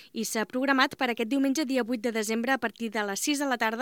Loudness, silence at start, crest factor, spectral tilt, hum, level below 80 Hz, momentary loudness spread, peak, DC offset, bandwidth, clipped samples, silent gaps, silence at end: -28 LUFS; 0 s; 20 dB; -2.5 dB/octave; none; -78 dBFS; 6 LU; -8 dBFS; under 0.1%; 18 kHz; under 0.1%; none; 0 s